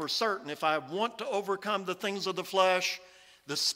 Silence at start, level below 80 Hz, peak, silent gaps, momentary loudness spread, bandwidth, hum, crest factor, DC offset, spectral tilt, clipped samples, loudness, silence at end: 0 s; -80 dBFS; -12 dBFS; none; 7 LU; 16 kHz; none; 20 dB; under 0.1%; -2.5 dB/octave; under 0.1%; -31 LUFS; 0 s